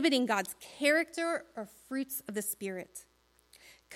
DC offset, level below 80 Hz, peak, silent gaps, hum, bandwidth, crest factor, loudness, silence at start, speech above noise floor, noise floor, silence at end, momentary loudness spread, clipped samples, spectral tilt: under 0.1%; -76 dBFS; -14 dBFS; none; none; 16.5 kHz; 20 dB; -33 LUFS; 0 s; 31 dB; -65 dBFS; 0 s; 17 LU; under 0.1%; -2.5 dB/octave